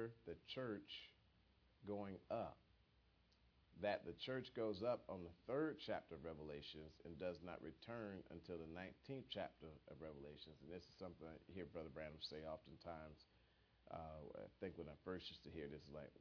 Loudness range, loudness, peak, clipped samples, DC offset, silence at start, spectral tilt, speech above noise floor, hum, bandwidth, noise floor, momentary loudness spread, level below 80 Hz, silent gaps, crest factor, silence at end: 7 LU; -52 LUFS; -30 dBFS; under 0.1%; under 0.1%; 0 s; -4 dB/octave; 25 dB; none; 5.4 kHz; -77 dBFS; 12 LU; -74 dBFS; none; 22 dB; 0 s